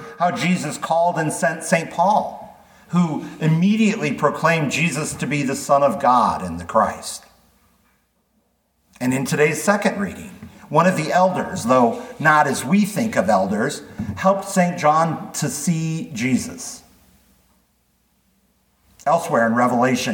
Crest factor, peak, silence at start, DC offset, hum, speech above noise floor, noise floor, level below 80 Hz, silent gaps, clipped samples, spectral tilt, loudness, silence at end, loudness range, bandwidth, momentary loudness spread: 18 dB; -2 dBFS; 0 s; under 0.1%; none; 47 dB; -65 dBFS; -56 dBFS; none; under 0.1%; -5 dB/octave; -19 LUFS; 0 s; 7 LU; 19 kHz; 10 LU